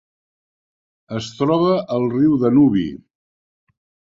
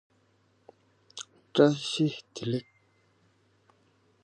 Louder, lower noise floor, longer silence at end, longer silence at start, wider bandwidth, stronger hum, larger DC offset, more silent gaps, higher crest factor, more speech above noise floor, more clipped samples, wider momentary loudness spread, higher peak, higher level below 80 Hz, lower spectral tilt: first, -17 LUFS vs -28 LUFS; first, under -90 dBFS vs -68 dBFS; second, 1.2 s vs 1.6 s; about the same, 1.1 s vs 1.15 s; second, 7.6 kHz vs 10 kHz; neither; neither; neither; second, 16 dB vs 26 dB; first, over 73 dB vs 41 dB; neither; second, 14 LU vs 20 LU; first, -4 dBFS vs -8 dBFS; first, -54 dBFS vs -76 dBFS; first, -8 dB/octave vs -5.5 dB/octave